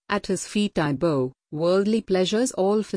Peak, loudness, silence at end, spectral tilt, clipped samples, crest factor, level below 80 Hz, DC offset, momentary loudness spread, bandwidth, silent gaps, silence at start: -8 dBFS; -23 LUFS; 0 s; -5 dB/octave; under 0.1%; 16 dB; -54 dBFS; under 0.1%; 5 LU; 10.5 kHz; none; 0.1 s